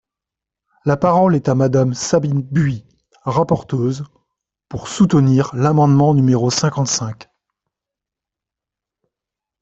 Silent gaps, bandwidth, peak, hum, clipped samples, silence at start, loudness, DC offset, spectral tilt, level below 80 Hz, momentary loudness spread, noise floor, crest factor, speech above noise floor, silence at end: none; 8.2 kHz; -2 dBFS; none; under 0.1%; 0.85 s; -16 LUFS; under 0.1%; -6.5 dB/octave; -50 dBFS; 16 LU; -86 dBFS; 14 dB; 71 dB; 2.4 s